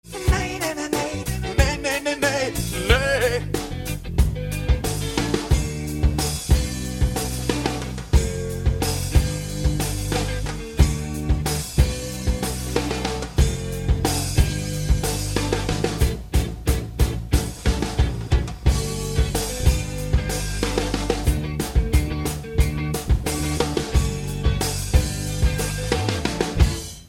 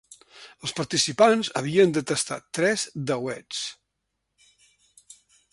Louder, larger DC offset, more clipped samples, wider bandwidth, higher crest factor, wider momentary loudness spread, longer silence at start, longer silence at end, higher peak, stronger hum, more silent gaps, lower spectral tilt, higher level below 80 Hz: about the same, -23 LUFS vs -24 LUFS; neither; neither; first, 17 kHz vs 11.5 kHz; about the same, 20 dB vs 22 dB; second, 5 LU vs 13 LU; second, 0.05 s vs 0.35 s; second, 0 s vs 1.8 s; about the same, -2 dBFS vs -4 dBFS; neither; neither; first, -5 dB/octave vs -3.5 dB/octave; first, -26 dBFS vs -66 dBFS